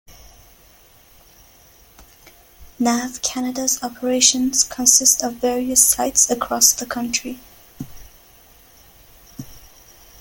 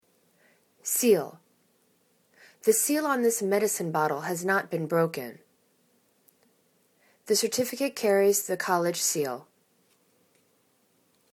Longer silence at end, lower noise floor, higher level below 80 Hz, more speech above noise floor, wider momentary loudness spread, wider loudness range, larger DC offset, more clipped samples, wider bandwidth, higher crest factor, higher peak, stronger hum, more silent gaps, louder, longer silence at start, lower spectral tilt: second, 0.6 s vs 1.9 s; second, -50 dBFS vs -68 dBFS; first, -50 dBFS vs -80 dBFS; second, 31 dB vs 42 dB; first, 25 LU vs 7 LU; first, 14 LU vs 5 LU; neither; neither; second, 17 kHz vs 19 kHz; about the same, 22 dB vs 20 dB; first, 0 dBFS vs -8 dBFS; neither; neither; first, -16 LUFS vs -26 LUFS; second, 0.1 s vs 0.85 s; second, -0.5 dB/octave vs -3.5 dB/octave